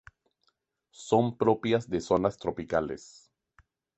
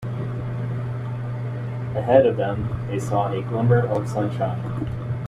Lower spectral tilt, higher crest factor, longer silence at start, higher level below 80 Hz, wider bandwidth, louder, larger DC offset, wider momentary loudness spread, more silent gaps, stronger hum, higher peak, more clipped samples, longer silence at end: second, -6.5 dB/octave vs -8.5 dB/octave; about the same, 20 dB vs 20 dB; first, 1 s vs 0 s; second, -58 dBFS vs -46 dBFS; second, 8.4 kHz vs 10.5 kHz; second, -28 LUFS vs -23 LUFS; neither; about the same, 12 LU vs 11 LU; neither; neither; second, -10 dBFS vs -2 dBFS; neither; first, 0.95 s vs 0 s